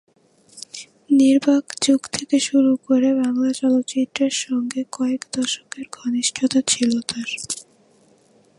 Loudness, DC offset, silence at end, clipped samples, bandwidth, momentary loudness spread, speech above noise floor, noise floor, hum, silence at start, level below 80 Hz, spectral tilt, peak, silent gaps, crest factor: -20 LUFS; under 0.1%; 0.95 s; under 0.1%; 11.5 kHz; 12 LU; 36 dB; -56 dBFS; none; 0.55 s; -66 dBFS; -2.5 dB/octave; -2 dBFS; none; 20 dB